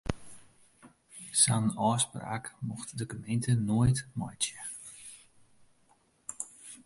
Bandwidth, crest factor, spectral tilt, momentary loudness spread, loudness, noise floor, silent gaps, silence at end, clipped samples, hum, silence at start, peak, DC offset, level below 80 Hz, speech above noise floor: 11.5 kHz; 22 dB; -4 dB/octave; 20 LU; -31 LUFS; -67 dBFS; none; 0.1 s; under 0.1%; none; 0.05 s; -10 dBFS; under 0.1%; -54 dBFS; 37 dB